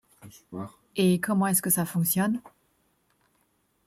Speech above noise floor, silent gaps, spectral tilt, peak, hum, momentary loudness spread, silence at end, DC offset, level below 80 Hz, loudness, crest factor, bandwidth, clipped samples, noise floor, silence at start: 44 dB; none; -5 dB/octave; -10 dBFS; none; 17 LU; 1.4 s; under 0.1%; -68 dBFS; -25 LUFS; 20 dB; 16.5 kHz; under 0.1%; -70 dBFS; 0.25 s